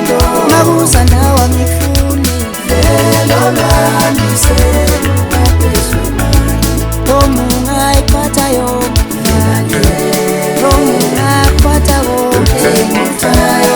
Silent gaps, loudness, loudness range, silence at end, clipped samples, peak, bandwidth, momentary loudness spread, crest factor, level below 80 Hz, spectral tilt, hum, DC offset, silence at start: none; -10 LUFS; 2 LU; 0 s; 0.4%; 0 dBFS; over 20 kHz; 4 LU; 10 dB; -16 dBFS; -5 dB/octave; none; under 0.1%; 0 s